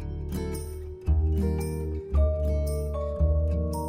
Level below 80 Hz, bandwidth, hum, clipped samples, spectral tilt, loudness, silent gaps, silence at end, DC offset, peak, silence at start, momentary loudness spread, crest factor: -28 dBFS; 15.5 kHz; none; under 0.1%; -8 dB/octave; -28 LUFS; none; 0 s; under 0.1%; -14 dBFS; 0 s; 9 LU; 14 dB